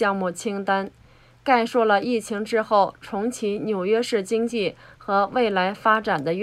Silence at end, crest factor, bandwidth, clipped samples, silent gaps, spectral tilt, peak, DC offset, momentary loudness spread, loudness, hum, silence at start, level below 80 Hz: 0 s; 18 dB; 14 kHz; under 0.1%; none; -5 dB/octave; -4 dBFS; under 0.1%; 8 LU; -23 LUFS; none; 0 s; -60 dBFS